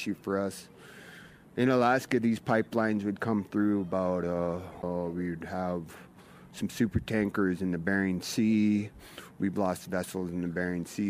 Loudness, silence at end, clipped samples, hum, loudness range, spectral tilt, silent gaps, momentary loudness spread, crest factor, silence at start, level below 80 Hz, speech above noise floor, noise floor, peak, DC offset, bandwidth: -30 LUFS; 0 s; under 0.1%; none; 4 LU; -6.5 dB/octave; none; 20 LU; 18 dB; 0 s; -56 dBFS; 21 dB; -51 dBFS; -12 dBFS; under 0.1%; 15.5 kHz